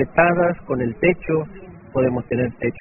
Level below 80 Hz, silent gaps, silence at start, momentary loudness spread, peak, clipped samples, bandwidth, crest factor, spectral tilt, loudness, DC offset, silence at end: -44 dBFS; none; 0 s; 9 LU; 0 dBFS; under 0.1%; 3.1 kHz; 20 dB; -3.5 dB/octave; -20 LUFS; under 0.1%; 0 s